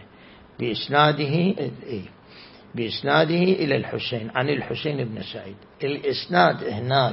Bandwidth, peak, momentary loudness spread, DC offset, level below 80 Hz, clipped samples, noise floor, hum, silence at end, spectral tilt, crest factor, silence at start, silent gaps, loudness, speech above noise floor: 5.8 kHz; -4 dBFS; 15 LU; under 0.1%; -60 dBFS; under 0.1%; -48 dBFS; none; 0 s; -10 dB/octave; 20 dB; 0 s; none; -23 LUFS; 26 dB